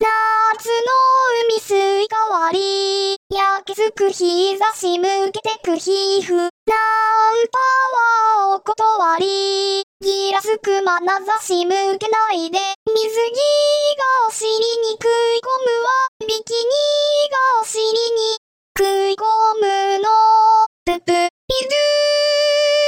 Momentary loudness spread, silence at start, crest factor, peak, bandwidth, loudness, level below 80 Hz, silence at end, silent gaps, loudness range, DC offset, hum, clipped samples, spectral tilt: 5 LU; 0 s; 12 dB; -6 dBFS; 17 kHz; -17 LUFS; -54 dBFS; 0 s; 3.16-3.30 s, 6.50-6.67 s, 9.83-10.00 s, 12.75-12.86 s, 16.08-16.20 s, 18.37-18.75 s, 20.66-20.86 s, 21.30-21.48 s; 3 LU; under 0.1%; none; under 0.1%; -1.5 dB/octave